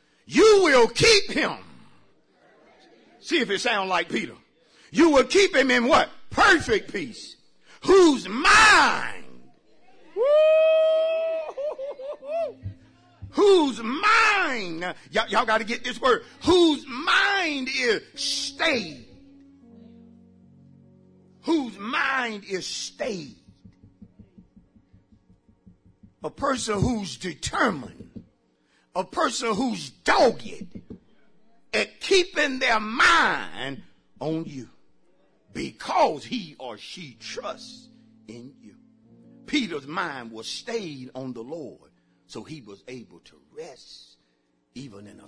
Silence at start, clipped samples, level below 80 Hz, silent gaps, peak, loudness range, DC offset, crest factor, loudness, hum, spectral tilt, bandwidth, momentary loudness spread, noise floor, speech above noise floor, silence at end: 0.3 s; under 0.1%; -52 dBFS; none; -8 dBFS; 15 LU; under 0.1%; 18 dB; -22 LUFS; none; -3 dB/octave; 10.5 kHz; 24 LU; -69 dBFS; 46 dB; 0.2 s